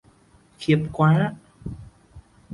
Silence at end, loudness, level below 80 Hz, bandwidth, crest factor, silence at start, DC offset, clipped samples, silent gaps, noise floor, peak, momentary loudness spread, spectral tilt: 0 s; -22 LUFS; -50 dBFS; 11 kHz; 18 dB; 0.6 s; under 0.1%; under 0.1%; none; -56 dBFS; -6 dBFS; 20 LU; -8 dB/octave